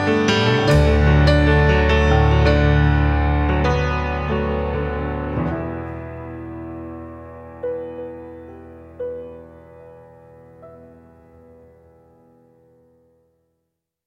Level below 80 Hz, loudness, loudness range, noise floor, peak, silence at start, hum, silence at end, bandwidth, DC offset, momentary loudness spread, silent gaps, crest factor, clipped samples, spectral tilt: -26 dBFS; -18 LUFS; 22 LU; -77 dBFS; -2 dBFS; 0 s; none; 3.3 s; 8.2 kHz; under 0.1%; 21 LU; none; 18 dB; under 0.1%; -7 dB/octave